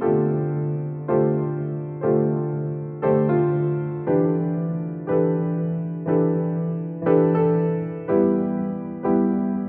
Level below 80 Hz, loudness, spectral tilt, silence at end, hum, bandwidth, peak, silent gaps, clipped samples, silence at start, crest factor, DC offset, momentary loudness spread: -60 dBFS; -22 LUFS; -11 dB/octave; 0 s; none; 3.3 kHz; -6 dBFS; none; under 0.1%; 0 s; 16 dB; under 0.1%; 8 LU